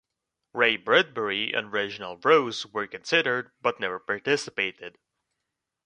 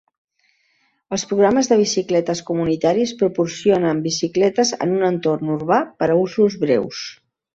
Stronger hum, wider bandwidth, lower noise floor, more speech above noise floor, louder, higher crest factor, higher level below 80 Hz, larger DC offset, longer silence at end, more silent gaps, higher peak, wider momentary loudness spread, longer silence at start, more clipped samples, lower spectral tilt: neither; first, 10 kHz vs 8 kHz; first, -84 dBFS vs -64 dBFS; first, 58 dB vs 46 dB; second, -25 LUFS vs -19 LUFS; first, 22 dB vs 16 dB; second, -72 dBFS vs -58 dBFS; neither; first, 0.95 s vs 0.4 s; neither; about the same, -4 dBFS vs -4 dBFS; first, 11 LU vs 6 LU; second, 0.55 s vs 1.1 s; neither; second, -3.5 dB/octave vs -5 dB/octave